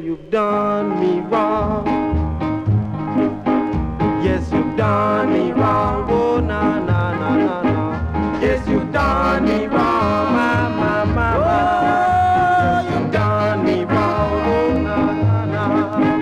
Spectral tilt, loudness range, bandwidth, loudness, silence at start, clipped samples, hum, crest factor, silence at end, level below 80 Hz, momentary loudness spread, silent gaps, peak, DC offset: -8 dB/octave; 3 LU; 9.6 kHz; -18 LUFS; 0 s; under 0.1%; none; 10 dB; 0 s; -32 dBFS; 4 LU; none; -6 dBFS; under 0.1%